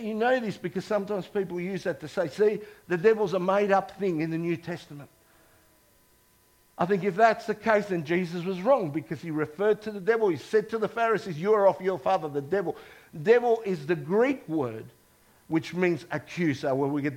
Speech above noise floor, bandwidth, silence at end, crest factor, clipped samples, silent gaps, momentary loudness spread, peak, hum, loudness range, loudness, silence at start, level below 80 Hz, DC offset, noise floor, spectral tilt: 36 dB; 16 kHz; 0 s; 20 dB; under 0.1%; none; 10 LU; -8 dBFS; none; 4 LU; -27 LUFS; 0 s; -68 dBFS; under 0.1%; -63 dBFS; -7 dB/octave